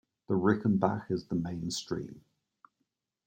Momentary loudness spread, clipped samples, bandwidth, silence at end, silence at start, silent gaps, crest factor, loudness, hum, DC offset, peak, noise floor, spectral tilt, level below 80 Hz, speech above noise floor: 11 LU; under 0.1%; 16 kHz; 1.05 s; 0.3 s; none; 22 dB; -31 LUFS; none; under 0.1%; -12 dBFS; -83 dBFS; -6 dB/octave; -66 dBFS; 52 dB